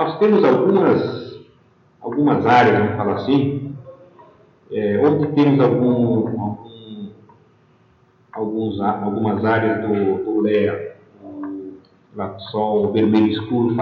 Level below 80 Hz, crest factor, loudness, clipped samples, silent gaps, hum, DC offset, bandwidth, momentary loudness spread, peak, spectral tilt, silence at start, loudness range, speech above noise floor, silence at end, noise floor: -60 dBFS; 16 dB; -18 LUFS; under 0.1%; none; none; under 0.1%; 6.8 kHz; 20 LU; -2 dBFS; -9 dB/octave; 0 s; 6 LU; 38 dB; 0 s; -55 dBFS